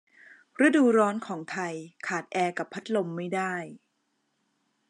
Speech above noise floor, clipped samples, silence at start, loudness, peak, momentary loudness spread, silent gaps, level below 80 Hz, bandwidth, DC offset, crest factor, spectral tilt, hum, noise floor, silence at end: 49 dB; under 0.1%; 0.3 s; -27 LUFS; -10 dBFS; 15 LU; none; -90 dBFS; 11 kHz; under 0.1%; 18 dB; -5.5 dB/octave; none; -76 dBFS; 1.15 s